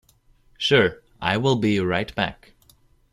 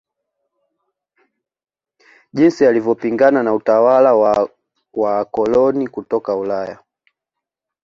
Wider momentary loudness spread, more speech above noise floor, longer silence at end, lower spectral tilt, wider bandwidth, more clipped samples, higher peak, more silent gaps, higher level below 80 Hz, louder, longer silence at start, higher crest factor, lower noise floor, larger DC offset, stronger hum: second, 9 LU vs 12 LU; second, 37 dB vs 68 dB; second, 0.8 s vs 1.1 s; second, -5.5 dB/octave vs -7 dB/octave; first, 14 kHz vs 7.4 kHz; neither; about the same, -4 dBFS vs -2 dBFS; neither; first, -52 dBFS vs -58 dBFS; second, -22 LUFS vs -15 LUFS; second, 0.6 s vs 2.35 s; about the same, 20 dB vs 16 dB; second, -58 dBFS vs -83 dBFS; neither; neither